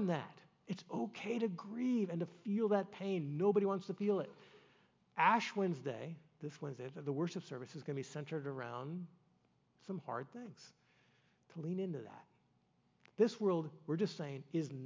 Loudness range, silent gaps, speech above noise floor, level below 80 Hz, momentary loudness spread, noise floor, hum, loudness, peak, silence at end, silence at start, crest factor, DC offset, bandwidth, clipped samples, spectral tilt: 11 LU; none; 37 dB; under -90 dBFS; 16 LU; -76 dBFS; none; -39 LUFS; -18 dBFS; 0 s; 0 s; 22 dB; under 0.1%; 7.6 kHz; under 0.1%; -7 dB/octave